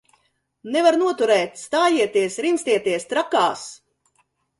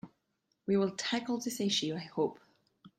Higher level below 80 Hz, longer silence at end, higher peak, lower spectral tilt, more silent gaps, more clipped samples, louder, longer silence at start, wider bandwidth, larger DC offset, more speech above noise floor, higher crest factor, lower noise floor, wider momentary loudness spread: first, -68 dBFS vs -76 dBFS; first, 0.85 s vs 0.1 s; first, -4 dBFS vs -18 dBFS; about the same, -3 dB/octave vs -4 dB/octave; neither; neither; first, -20 LUFS vs -33 LUFS; first, 0.65 s vs 0.05 s; second, 11.5 kHz vs 15 kHz; neither; about the same, 47 dB vs 47 dB; about the same, 16 dB vs 16 dB; second, -67 dBFS vs -80 dBFS; about the same, 7 LU vs 5 LU